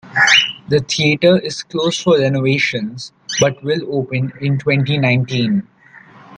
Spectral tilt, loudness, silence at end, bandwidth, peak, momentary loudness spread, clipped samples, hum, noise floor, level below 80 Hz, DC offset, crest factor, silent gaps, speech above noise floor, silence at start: -4.5 dB/octave; -15 LUFS; 0 s; 9.2 kHz; 0 dBFS; 10 LU; under 0.1%; none; -43 dBFS; -54 dBFS; under 0.1%; 16 dB; none; 28 dB; 0.05 s